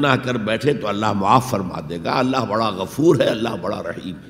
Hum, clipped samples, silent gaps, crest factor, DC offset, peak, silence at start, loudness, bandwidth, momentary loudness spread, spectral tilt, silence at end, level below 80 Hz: none; under 0.1%; none; 20 dB; under 0.1%; 0 dBFS; 0 s; -20 LUFS; 16 kHz; 10 LU; -6 dB/octave; 0 s; -52 dBFS